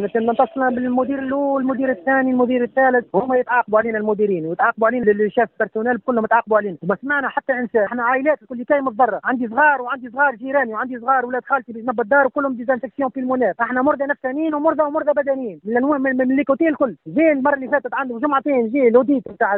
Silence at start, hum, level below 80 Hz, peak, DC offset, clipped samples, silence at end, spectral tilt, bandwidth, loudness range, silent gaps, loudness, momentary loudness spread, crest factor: 0 s; none; -62 dBFS; -2 dBFS; under 0.1%; under 0.1%; 0 s; -5 dB/octave; 4 kHz; 2 LU; none; -19 LUFS; 6 LU; 16 dB